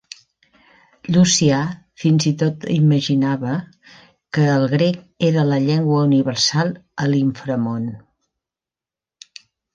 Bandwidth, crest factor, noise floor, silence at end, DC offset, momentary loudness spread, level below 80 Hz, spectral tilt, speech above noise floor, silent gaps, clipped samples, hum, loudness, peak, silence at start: 9.4 kHz; 16 dB; -90 dBFS; 1.75 s; under 0.1%; 9 LU; -58 dBFS; -5.5 dB/octave; 72 dB; none; under 0.1%; none; -18 LUFS; -2 dBFS; 1.05 s